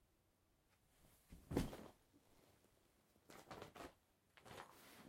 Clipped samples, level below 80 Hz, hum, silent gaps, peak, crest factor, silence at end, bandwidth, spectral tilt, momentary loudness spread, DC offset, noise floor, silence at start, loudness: under 0.1%; -66 dBFS; none; none; -26 dBFS; 30 dB; 0 s; 16 kHz; -5.5 dB/octave; 20 LU; under 0.1%; -80 dBFS; 0.95 s; -52 LUFS